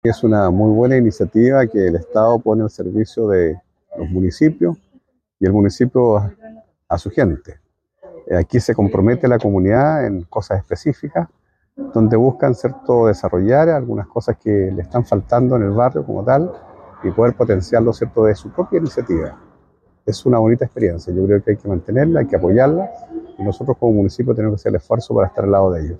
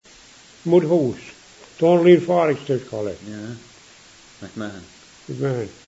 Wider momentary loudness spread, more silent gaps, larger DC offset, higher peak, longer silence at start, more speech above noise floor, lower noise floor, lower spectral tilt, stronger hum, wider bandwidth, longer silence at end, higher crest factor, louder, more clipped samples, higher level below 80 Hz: second, 9 LU vs 23 LU; neither; neither; about the same, -2 dBFS vs -2 dBFS; second, 0.05 s vs 0.65 s; first, 40 dB vs 28 dB; first, -56 dBFS vs -48 dBFS; first, -9 dB/octave vs -7 dB/octave; neither; first, 9.2 kHz vs 8 kHz; second, 0 s vs 0.15 s; second, 14 dB vs 20 dB; first, -16 LUFS vs -19 LUFS; neither; first, -42 dBFS vs -62 dBFS